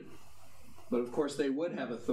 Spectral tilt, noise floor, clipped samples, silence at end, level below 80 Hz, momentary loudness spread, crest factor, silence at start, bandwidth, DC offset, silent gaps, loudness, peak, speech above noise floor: -5.5 dB/octave; -59 dBFS; under 0.1%; 0 s; -70 dBFS; 5 LU; 16 dB; 0 s; 15.5 kHz; under 0.1%; none; -35 LUFS; -20 dBFS; 26 dB